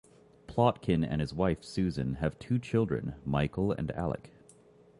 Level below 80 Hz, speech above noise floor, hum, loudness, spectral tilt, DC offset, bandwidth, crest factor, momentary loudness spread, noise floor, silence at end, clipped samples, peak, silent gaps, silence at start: -48 dBFS; 28 dB; none; -32 LUFS; -8 dB/octave; under 0.1%; 11.5 kHz; 20 dB; 7 LU; -59 dBFS; 0.7 s; under 0.1%; -12 dBFS; none; 0.5 s